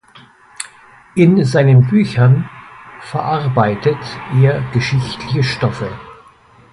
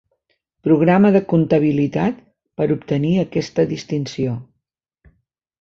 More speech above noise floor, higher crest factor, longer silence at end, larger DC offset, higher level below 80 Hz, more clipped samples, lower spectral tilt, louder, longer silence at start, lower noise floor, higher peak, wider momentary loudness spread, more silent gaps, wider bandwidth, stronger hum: second, 32 dB vs 59 dB; about the same, 14 dB vs 16 dB; second, 0.6 s vs 1.15 s; neither; first, -46 dBFS vs -52 dBFS; neither; about the same, -7.5 dB/octave vs -8 dB/octave; first, -15 LUFS vs -18 LUFS; about the same, 0.6 s vs 0.65 s; second, -46 dBFS vs -76 dBFS; about the same, 0 dBFS vs -2 dBFS; first, 19 LU vs 11 LU; neither; first, 11.5 kHz vs 7.4 kHz; neither